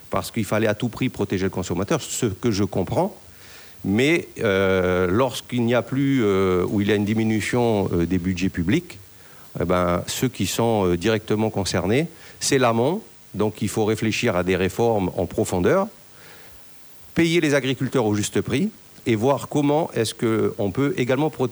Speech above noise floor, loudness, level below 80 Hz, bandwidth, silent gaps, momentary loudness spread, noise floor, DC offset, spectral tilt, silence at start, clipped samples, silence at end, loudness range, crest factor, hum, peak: 24 dB; -22 LUFS; -50 dBFS; over 20 kHz; none; 10 LU; -45 dBFS; under 0.1%; -5.5 dB/octave; 0 s; under 0.1%; 0 s; 3 LU; 16 dB; none; -6 dBFS